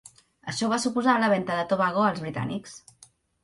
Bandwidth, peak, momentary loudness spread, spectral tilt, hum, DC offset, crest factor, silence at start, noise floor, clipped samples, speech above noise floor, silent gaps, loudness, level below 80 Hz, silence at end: 11.5 kHz; -10 dBFS; 16 LU; -5 dB/octave; none; under 0.1%; 18 dB; 0.45 s; -58 dBFS; under 0.1%; 32 dB; none; -25 LUFS; -64 dBFS; 0.65 s